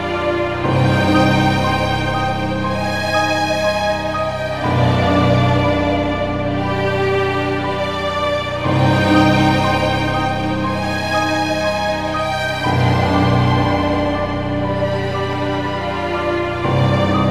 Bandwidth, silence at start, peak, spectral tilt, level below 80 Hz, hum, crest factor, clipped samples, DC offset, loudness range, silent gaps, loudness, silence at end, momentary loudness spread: 15 kHz; 0 s; -2 dBFS; -6.5 dB/octave; -32 dBFS; none; 16 dB; under 0.1%; 1%; 2 LU; none; -17 LUFS; 0 s; 6 LU